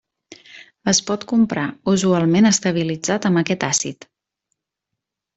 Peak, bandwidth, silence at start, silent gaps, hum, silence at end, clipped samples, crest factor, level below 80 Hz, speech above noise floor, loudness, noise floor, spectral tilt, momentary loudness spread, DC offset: -2 dBFS; 8.2 kHz; 0.3 s; none; none; 1.45 s; under 0.1%; 18 dB; -56 dBFS; 63 dB; -18 LUFS; -82 dBFS; -4 dB/octave; 7 LU; under 0.1%